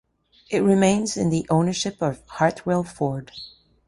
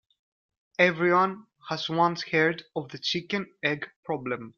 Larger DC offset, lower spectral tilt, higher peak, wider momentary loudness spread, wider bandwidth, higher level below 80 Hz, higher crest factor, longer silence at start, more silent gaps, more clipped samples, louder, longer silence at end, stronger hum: neither; about the same, -5.5 dB/octave vs -5.5 dB/octave; about the same, -4 dBFS vs -6 dBFS; about the same, 14 LU vs 12 LU; first, 11.5 kHz vs 7.2 kHz; first, -54 dBFS vs -70 dBFS; about the same, 18 dB vs 22 dB; second, 0.5 s vs 0.8 s; second, none vs 3.96-4.03 s; neither; first, -22 LUFS vs -27 LUFS; first, 0.4 s vs 0.1 s; neither